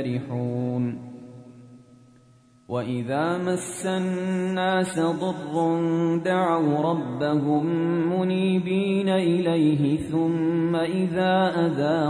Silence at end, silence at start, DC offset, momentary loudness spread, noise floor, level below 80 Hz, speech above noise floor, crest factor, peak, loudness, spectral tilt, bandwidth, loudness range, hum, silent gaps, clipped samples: 0 s; 0 s; under 0.1%; 7 LU; -56 dBFS; -62 dBFS; 33 dB; 14 dB; -10 dBFS; -24 LUFS; -6.5 dB/octave; 11 kHz; 7 LU; none; none; under 0.1%